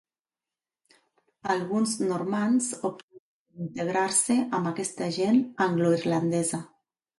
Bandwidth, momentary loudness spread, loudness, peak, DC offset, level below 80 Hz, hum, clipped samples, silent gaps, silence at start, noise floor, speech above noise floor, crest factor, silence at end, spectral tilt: 11.5 kHz; 10 LU; -26 LUFS; -12 dBFS; under 0.1%; -72 dBFS; none; under 0.1%; 3.03-3.08 s, 3.19-3.46 s; 1.45 s; under -90 dBFS; over 64 dB; 16 dB; 0.5 s; -4.5 dB/octave